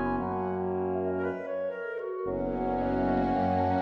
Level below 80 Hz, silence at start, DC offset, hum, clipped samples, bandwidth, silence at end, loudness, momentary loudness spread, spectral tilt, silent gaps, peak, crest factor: -48 dBFS; 0 s; under 0.1%; none; under 0.1%; 6 kHz; 0 s; -30 LUFS; 7 LU; -9.5 dB/octave; none; -16 dBFS; 14 dB